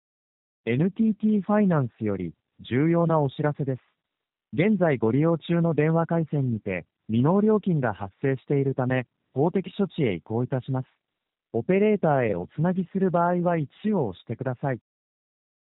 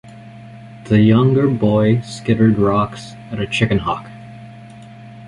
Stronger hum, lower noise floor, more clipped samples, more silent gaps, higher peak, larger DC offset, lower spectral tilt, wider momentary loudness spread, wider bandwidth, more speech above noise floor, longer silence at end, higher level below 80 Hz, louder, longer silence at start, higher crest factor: neither; first, -86 dBFS vs -37 dBFS; neither; neither; second, -8 dBFS vs -2 dBFS; neither; about the same, -8 dB/octave vs -7.5 dB/octave; second, 10 LU vs 24 LU; second, 4 kHz vs 11 kHz; first, 62 dB vs 22 dB; first, 0.9 s vs 0 s; second, -62 dBFS vs -44 dBFS; second, -25 LUFS vs -16 LUFS; first, 0.65 s vs 0.05 s; about the same, 16 dB vs 16 dB